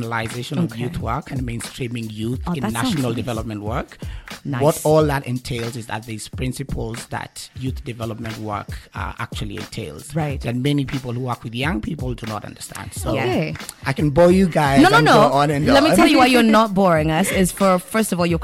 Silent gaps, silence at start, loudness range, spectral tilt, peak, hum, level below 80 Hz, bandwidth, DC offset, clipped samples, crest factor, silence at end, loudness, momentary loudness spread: none; 0 s; 14 LU; -5.5 dB/octave; -4 dBFS; none; -38 dBFS; 16.5 kHz; under 0.1%; under 0.1%; 14 dB; 0 s; -19 LUFS; 17 LU